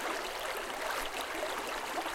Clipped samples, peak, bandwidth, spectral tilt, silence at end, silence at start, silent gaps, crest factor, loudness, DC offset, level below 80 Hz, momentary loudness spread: under 0.1%; -22 dBFS; 17 kHz; -1 dB/octave; 0 s; 0 s; none; 14 dB; -36 LUFS; under 0.1%; -58 dBFS; 1 LU